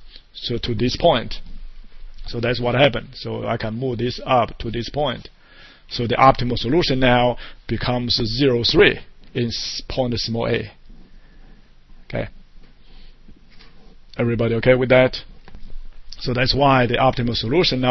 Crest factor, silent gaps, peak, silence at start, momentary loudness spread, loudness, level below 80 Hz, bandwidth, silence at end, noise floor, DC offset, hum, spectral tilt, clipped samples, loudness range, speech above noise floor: 20 dB; none; 0 dBFS; 0 s; 15 LU; -19 LUFS; -34 dBFS; 6.2 kHz; 0 s; -46 dBFS; under 0.1%; none; -6 dB/octave; under 0.1%; 10 LU; 27 dB